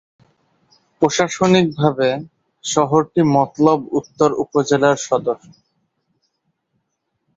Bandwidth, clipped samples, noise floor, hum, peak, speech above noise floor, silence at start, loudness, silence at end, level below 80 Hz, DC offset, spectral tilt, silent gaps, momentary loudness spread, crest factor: 8 kHz; under 0.1%; -73 dBFS; none; -2 dBFS; 56 dB; 1 s; -17 LUFS; 2 s; -58 dBFS; under 0.1%; -5.5 dB/octave; none; 8 LU; 18 dB